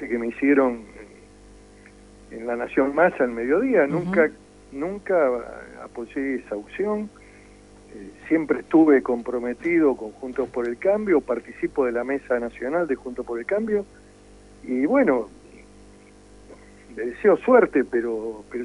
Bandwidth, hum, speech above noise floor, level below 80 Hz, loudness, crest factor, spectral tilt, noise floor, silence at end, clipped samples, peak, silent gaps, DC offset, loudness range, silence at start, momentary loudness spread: 11 kHz; 50 Hz at -55 dBFS; 26 dB; -54 dBFS; -23 LUFS; 20 dB; -7.5 dB/octave; -49 dBFS; 0 s; under 0.1%; -4 dBFS; none; under 0.1%; 5 LU; 0 s; 18 LU